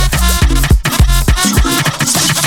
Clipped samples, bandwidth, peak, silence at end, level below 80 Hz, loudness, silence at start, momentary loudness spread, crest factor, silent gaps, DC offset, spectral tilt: under 0.1%; 19.5 kHz; 0 dBFS; 0 s; -14 dBFS; -11 LUFS; 0 s; 1 LU; 10 dB; none; under 0.1%; -3.5 dB/octave